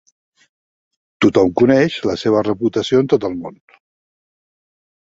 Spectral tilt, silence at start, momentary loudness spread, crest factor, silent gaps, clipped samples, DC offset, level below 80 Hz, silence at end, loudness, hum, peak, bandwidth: -6.5 dB/octave; 1.2 s; 9 LU; 16 dB; none; under 0.1%; under 0.1%; -52 dBFS; 1.65 s; -16 LUFS; none; -2 dBFS; 7.8 kHz